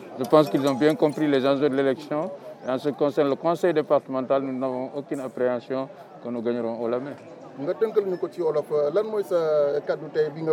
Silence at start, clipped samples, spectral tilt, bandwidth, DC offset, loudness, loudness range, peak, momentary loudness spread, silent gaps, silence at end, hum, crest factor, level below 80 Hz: 0 s; under 0.1%; -7 dB/octave; 14 kHz; under 0.1%; -24 LUFS; 5 LU; -4 dBFS; 10 LU; none; 0 s; none; 20 dB; -86 dBFS